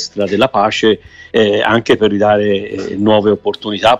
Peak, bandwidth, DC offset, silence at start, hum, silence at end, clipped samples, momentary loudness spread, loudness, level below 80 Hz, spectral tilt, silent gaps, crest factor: 0 dBFS; 9.6 kHz; under 0.1%; 0 s; none; 0 s; under 0.1%; 7 LU; -13 LUFS; -46 dBFS; -5 dB/octave; none; 12 dB